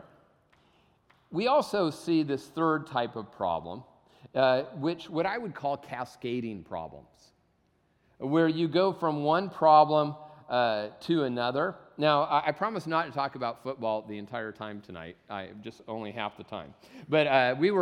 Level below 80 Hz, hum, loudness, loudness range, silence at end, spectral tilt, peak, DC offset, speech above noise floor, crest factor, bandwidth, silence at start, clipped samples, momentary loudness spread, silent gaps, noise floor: -68 dBFS; none; -28 LUFS; 10 LU; 0 s; -6.5 dB/octave; -8 dBFS; under 0.1%; 41 dB; 22 dB; 13.5 kHz; 1.3 s; under 0.1%; 16 LU; none; -70 dBFS